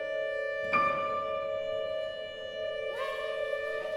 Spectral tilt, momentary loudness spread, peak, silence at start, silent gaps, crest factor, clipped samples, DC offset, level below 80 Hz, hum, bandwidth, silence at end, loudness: -4 dB/octave; 9 LU; -16 dBFS; 0 s; none; 18 dB; under 0.1%; under 0.1%; -64 dBFS; none; 12.5 kHz; 0 s; -33 LUFS